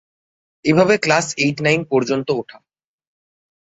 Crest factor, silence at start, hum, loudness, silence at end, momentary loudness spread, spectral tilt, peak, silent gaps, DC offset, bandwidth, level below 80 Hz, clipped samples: 18 dB; 0.65 s; none; -17 LUFS; 1.35 s; 9 LU; -5 dB/octave; -2 dBFS; none; under 0.1%; 8.4 kHz; -56 dBFS; under 0.1%